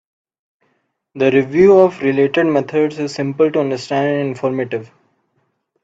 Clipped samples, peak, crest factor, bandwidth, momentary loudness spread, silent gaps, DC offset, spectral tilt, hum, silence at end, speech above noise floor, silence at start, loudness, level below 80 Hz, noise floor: under 0.1%; 0 dBFS; 16 dB; 7.8 kHz; 11 LU; none; under 0.1%; -7 dB/octave; none; 1 s; 51 dB; 1.15 s; -15 LUFS; -56 dBFS; -66 dBFS